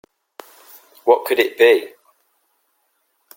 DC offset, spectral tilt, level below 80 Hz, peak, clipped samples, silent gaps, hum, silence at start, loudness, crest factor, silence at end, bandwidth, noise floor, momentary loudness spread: under 0.1%; -2.5 dB/octave; -68 dBFS; -2 dBFS; under 0.1%; none; none; 1.05 s; -16 LUFS; 20 dB; 1.5 s; 17 kHz; -67 dBFS; 10 LU